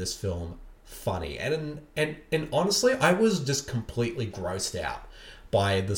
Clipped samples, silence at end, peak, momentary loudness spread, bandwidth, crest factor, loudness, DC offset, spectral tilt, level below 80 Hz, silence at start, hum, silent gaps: under 0.1%; 0 s; -10 dBFS; 14 LU; 18.5 kHz; 18 dB; -28 LUFS; under 0.1%; -4.5 dB/octave; -48 dBFS; 0 s; none; none